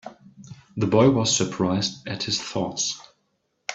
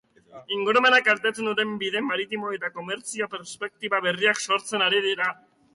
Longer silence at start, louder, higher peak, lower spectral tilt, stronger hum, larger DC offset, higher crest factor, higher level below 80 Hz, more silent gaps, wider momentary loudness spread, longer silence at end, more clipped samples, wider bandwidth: second, 0.05 s vs 0.35 s; about the same, -23 LUFS vs -24 LUFS; about the same, -6 dBFS vs -8 dBFS; first, -4 dB/octave vs -2 dB/octave; neither; neither; about the same, 20 dB vs 18 dB; first, -58 dBFS vs -74 dBFS; neither; first, 18 LU vs 13 LU; second, 0 s vs 0.4 s; neither; second, 8.4 kHz vs 11.5 kHz